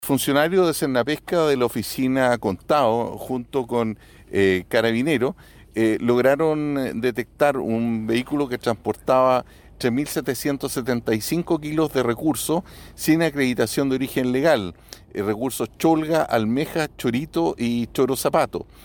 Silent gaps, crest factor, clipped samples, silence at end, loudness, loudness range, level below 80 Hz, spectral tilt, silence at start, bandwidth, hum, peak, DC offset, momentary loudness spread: none; 16 dB; under 0.1%; 0.2 s; -22 LUFS; 2 LU; -50 dBFS; -5 dB/octave; 0 s; 19.5 kHz; none; -6 dBFS; under 0.1%; 7 LU